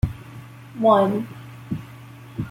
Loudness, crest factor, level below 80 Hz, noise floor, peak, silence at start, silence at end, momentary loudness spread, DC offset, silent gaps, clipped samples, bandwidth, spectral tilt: -22 LUFS; 20 dB; -42 dBFS; -41 dBFS; -4 dBFS; 0.05 s; 0 s; 24 LU; under 0.1%; none; under 0.1%; 16.5 kHz; -8.5 dB/octave